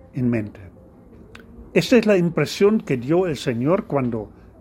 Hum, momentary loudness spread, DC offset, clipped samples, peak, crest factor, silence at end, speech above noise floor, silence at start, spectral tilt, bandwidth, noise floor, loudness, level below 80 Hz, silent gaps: none; 10 LU; under 0.1%; under 0.1%; -2 dBFS; 20 dB; 0.3 s; 27 dB; 0.15 s; -6.5 dB/octave; 16 kHz; -46 dBFS; -20 LUFS; -50 dBFS; none